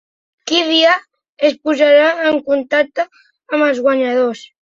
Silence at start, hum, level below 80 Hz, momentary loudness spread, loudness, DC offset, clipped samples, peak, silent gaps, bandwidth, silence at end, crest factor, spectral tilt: 0.45 s; none; -64 dBFS; 10 LU; -14 LUFS; under 0.1%; under 0.1%; -2 dBFS; 1.29-1.37 s; 7.6 kHz; 0.3 s; 14 dB; -2.5 dB/octave